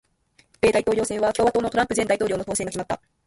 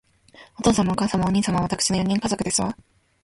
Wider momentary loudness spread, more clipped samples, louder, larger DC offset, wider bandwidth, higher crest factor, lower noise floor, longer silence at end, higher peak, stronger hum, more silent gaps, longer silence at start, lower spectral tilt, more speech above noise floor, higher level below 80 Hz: first, 7 LU vs 3 LU; neither; about the same, -23 LUFS vs -22 LUFS; neither; about the same, 11.5 kHz vs 11.5 kHz; about the same, 16 dB vs 18 dB; first, -62 dBFS vs -51 dBFS; second, 0.3 s vs 0.5 s; about the same, -6 dBFS vs -6 dBFS; neither; neither; first, 0.65 s vs 0.4 s; about the same, -4 dB/octave vs -4.5 dB/octave; first, 40 dB vs 29 dB; about the same, -50 dBFS vs -46 dBFS